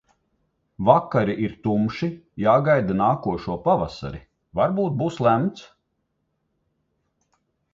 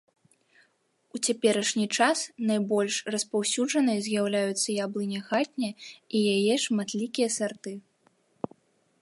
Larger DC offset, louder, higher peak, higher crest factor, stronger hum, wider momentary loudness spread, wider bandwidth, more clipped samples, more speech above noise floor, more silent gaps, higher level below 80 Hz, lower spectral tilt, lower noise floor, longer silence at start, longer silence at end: neither; first, -22 LUFS vs -27 LUFS; first, 0 dBFS vs -8 dBFS; about the same, 22 dB vs 20 dB; neither; second, 11 LU vs 15 LU; second, 7.6 kHz vs 11.5 kHz; neither; first, 53 dB vs 43 dB; neither; first, -50 dBFS vs -78 dBFS; first, -8.5 dB/octave vs -3.5 dB/octave; first, -74 dBFS vs -70 dBFS; second, 0.8 s vs 1.15 s; first, 2.1 s vs 1.2 s